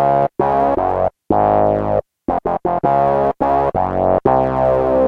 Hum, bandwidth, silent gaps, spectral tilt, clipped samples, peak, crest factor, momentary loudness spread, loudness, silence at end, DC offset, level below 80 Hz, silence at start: none; 5.6 kHz; none; -9.5 dB/octave; under 0.1%; -2 dBFS; 14 dB; 5 LU; -16 LUFS; 0 s; under 0.1%; -36 dBFS; 0 s